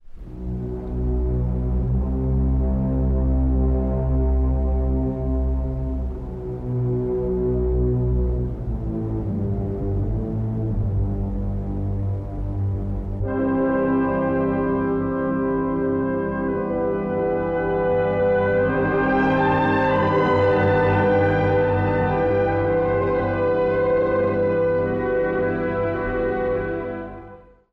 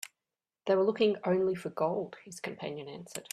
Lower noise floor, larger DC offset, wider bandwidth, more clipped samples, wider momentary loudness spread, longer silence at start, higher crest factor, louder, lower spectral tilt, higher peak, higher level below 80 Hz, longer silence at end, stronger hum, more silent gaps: second, -44 dBFS vs under -90 dBFS; neither; second, 4.8 kHz vs 14.5 kHz; neither; second, 9 LU vs 15 LU; second, 0.05 s vs 0.65 s; second, 10 dB vs 18 dB; first, -22 LUFS vs -32 LUFS; first, -10 dB/octave vs -5 dB/octave; first, -10 dBFS vs -14 dBFS; first, -28 dBFS vs -76 dBFS; first, 0.3 s vs 0.1 s; neither; neither